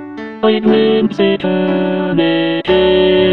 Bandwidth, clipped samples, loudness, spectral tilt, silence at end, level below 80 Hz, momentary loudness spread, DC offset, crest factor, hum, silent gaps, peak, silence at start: 6 kHz; under 0.1%; -13 LUFS; -8 dB/octave; 0 s; -42 dBFS; 5 LU; 0.6%; 12 dB; none; none; 0 dBFS; 0 s